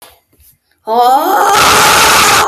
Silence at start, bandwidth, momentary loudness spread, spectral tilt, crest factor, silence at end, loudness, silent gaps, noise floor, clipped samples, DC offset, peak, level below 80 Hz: 0.85 s; 16 kHz; 5 LU; -1 dB/octave; 10 dB; 0 s; -7 LUFS; none; -49 dBFS; 0.2%; under 0.1%; 0 dBFS; -40 dBFS